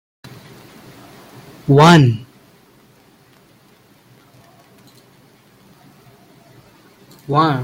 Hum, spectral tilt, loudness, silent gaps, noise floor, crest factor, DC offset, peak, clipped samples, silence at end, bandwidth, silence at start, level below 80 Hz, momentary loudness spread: none; -6.5 dB/octave; -13 LUFS; none; -51 dBFS; 20 dB; under 0.1%; 0 dBFS; under 0.1%; 0 s; 16 kHz; 1.7 s; -56 dBFS; 28 LU